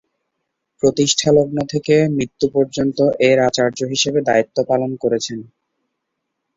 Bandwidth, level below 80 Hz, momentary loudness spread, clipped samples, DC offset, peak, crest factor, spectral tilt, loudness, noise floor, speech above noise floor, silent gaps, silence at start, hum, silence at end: 7.8 kHz; -54 dBFS; 6 LU; under 0.1%; under 0.1%; -2 dBFS; 16 dB; -4.5 dB/octave; -17 LUFS; -76 dBFS; 60 dB; none; 0.85 s; none; 1.15 s